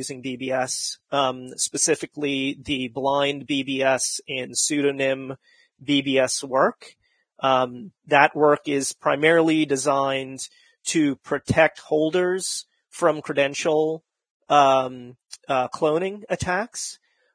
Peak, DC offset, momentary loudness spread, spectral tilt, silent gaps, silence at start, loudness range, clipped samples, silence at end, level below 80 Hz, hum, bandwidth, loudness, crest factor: 0 dBFS; under 0.1%; 13 LU; -3.5 dB/octave; 14.30-14.40 s; 0 s; 3 LU; under 0.1%; 0.4 s; -58 dBFS; none; 10.5 kHz; -22 LUFS; 24 dB